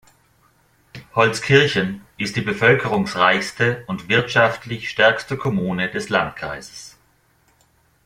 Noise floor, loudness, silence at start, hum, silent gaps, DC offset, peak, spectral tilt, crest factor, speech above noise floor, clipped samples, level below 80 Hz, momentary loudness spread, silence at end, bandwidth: -60 dBFS; -19 LUFS; 0.95 s; none; none; under 0.1%; -2 dBFS; -5 dB/octave; 20 dB; 41 dB; under 0.1%; -54 dBFS; 12 LU; 1.2 s; 15.5 kHz